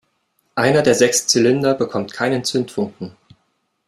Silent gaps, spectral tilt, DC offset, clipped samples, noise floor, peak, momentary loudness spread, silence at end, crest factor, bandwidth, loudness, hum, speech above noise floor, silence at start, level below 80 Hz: none; -3.5 dB/octave; under 0.1%; under 0.1%; -68 dBFS; -2 dBFS; 13 LU; 0.8 s; 18 dB; 15.5 kHz; -17 LUFS; none; 51 dB; 0.55 s; -58 dBFS